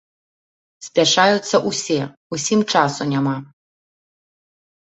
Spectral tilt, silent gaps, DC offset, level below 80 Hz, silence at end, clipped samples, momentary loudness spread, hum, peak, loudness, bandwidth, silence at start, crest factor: -3.5 dB/octave; 2.17-2.30 s; under 0.1%; -62 dBFS; 1.5 s; under 0.1%; 11 LU; none; 0 dBFS; -18 LUFS; 8.4 kHz; 0.8 s; 20 dB